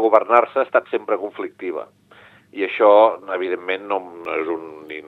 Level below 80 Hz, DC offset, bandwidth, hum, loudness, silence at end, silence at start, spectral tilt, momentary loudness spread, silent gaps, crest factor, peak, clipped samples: -74 dBFS; under 0.1%; 4.4 kHz; 50 Hz at -60 dBFS; -19 LUFS; 0.05 s; 0 s; -6 dB/octave; 15 LU; none; 20 dB; 0 dBFS; under 0.1%